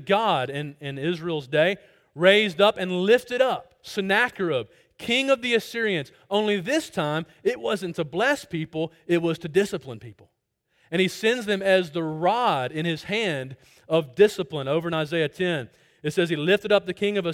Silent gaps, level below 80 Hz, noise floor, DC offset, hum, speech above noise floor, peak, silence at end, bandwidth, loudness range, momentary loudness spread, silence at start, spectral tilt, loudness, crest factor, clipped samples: none; -64 dBFS; -69 dBFS; under 0.1%; none; 45 dB; -6 dBFS; 0 s; 16.5 kHz; 4 LU; 10 LU; 0 s; -5 dB/octave; -24 LUFS; 20 dB; under 0.1%